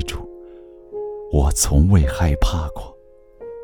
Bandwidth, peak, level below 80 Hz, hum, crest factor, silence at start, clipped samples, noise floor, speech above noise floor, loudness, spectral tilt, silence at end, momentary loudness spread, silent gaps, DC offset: 19.5 kHz; -2 dBFS; -24 dBFS; none; 18 dB; 0 s; under 0.1%; -46 dBFS; 30 dB; -19 LUFS; -5.5 dB/octave; 0 s; 23 LU; none; under 0.1%